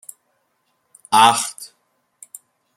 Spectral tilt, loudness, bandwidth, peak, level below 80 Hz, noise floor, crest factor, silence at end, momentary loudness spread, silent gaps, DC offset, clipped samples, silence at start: -1 dB/octave; -15 LUFS; 16.5 kHz; 0 dBFS; -72 dBFS; -68 dBFS; 22 dB; 1.1 s; 27 LU; none; under 0.1%; under 0.1%; 1.1 s